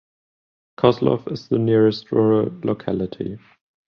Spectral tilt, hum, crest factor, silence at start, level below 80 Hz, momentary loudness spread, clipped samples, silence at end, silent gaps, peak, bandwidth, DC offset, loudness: -9 dB/octave; none; 18 dB; 0.8 s; -54 dBFS; 11 LU; under 0.1%; 0.5 s; none; -2 dBFS; 6.6 kHz; under 0.1%; -20 LUFS